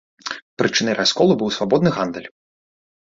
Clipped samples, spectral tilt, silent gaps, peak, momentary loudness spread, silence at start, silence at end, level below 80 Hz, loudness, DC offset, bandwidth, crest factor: under 0.1%; -4.5 dB/octave; 0.42-0.57 s; -2 dBFS; 14 LU; 0.25 s; 0.9 s; -58 dBFS; -18 LUFS; under 0.1%; 7.8 kHz; 18 dB